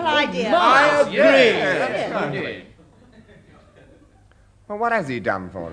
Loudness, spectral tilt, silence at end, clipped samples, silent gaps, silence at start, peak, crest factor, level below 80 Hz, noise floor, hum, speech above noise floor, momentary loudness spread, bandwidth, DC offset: -18 LUFS; -4.5 dB/octave; 0 s; under 0.1%; none; 0 s; -2 dBFS; 18 dB; -56 dBFS; -53 dBFS; none; 34 dB; 14 LU; 10.5 kHz; under 0.1%